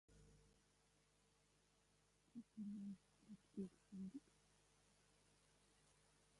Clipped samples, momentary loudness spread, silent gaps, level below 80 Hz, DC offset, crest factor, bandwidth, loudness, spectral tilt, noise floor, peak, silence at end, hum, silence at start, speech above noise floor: under 0.1%; 10 LU; none; -84 dBFS; under 0.1%; 20 dB; 11 kHz; -57 LUFS; -7 dB/octave; -80 dBFS; -40 dBFS; 0 s; 50 Hz at -70 dBFS; 0.1 s; 25 dB